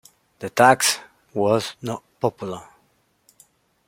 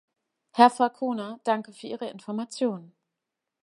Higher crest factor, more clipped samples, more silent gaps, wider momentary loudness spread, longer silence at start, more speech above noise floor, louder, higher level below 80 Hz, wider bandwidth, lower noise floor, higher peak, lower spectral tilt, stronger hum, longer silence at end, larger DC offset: about the same, 22 dB vs 24 dB; neither; neither; about the same, 18 LU vs 16 LU; second, 0.4 s vs 0.55 s; second, 44 dB vs 60 dB; first, -21 LUFS vs -26 LUFS; first, -64 dBFS vs -84 dBFS; first, 16.5 kHz vs 11.5 kHz; second, -64 dBFS vs -86 dBFS; about the same, -2 dBFS vs -4 dBFS; second, -3 dB/octave vs -4.5 dB/octave; neither; first, 1.25 s vs 0.75 s; neither